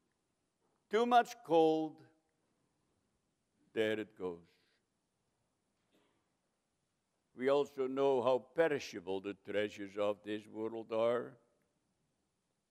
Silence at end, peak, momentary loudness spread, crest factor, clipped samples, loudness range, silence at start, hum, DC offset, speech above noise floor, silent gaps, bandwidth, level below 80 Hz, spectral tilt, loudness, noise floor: 1.35 s; -16 dBFS; 14 LU; 22 dB; under 0.1%; 9 LU; 0.9 s; none; under 0.1%; 49 dB; none; 14 kHz; -88 dBFS; -5 dB/octave; -36 LUFS; -84 dBFS